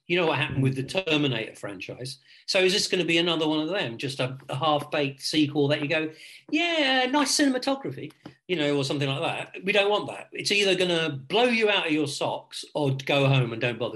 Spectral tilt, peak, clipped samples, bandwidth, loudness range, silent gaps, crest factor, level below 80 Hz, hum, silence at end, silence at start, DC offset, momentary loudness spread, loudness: -4.5 dB/octave; -8 dBFS; under 0.1%; 12.5 kHz; 2 LU; none; 18 dB; -66 dBFS; none; 0 s; 0.1 s; under 0.1%; 13 LU; -25 LUFS